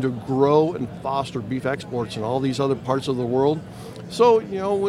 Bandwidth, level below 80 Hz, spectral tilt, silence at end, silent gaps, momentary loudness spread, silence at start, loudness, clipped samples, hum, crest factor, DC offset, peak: 12.5 kHz; -56 dBFS; -7 dB/octave; 0 s; none; 11 LU; 0 s; -22 LUFS; under 0.1%; none; 18 dB; under 0.1%; -4 dBFS